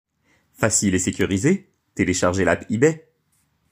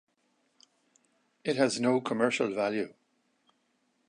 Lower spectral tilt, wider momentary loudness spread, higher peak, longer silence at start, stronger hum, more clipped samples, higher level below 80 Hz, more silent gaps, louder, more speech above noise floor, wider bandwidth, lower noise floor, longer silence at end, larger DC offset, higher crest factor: about the same, -4.5 dB/octave vs -4.5 dB/octave; second, 6 LU vs 10 LU; first, -2 dBFS vs -10 dBFS; second, 0.6 s vs 1.45 s; neither; neither; first, -54 dBFS vs -82 dBFS; neither; first, -20 LUFS vs -29 LUFS; about the same, 47 dB vs 46 dB; first, 16 kHz vs 11 kHz; second, -67 dBFS vs -74 dBFS; second, 0.75 s vs 1.15 s; neither; about the same, 20 dB vs 22 dB